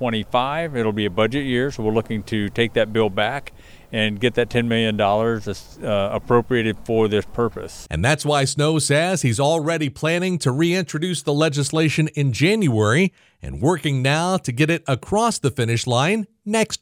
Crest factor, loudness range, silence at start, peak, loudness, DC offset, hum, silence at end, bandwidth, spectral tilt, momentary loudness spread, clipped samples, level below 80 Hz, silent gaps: 16 dB; 2 LU; 0 s; -4 dBFS; -20 LUFS; under 0.1%; none; 0.05 s; 16 kHz; -5 dB/octave; 6 LU; under 0.1%; -44 dBFS; none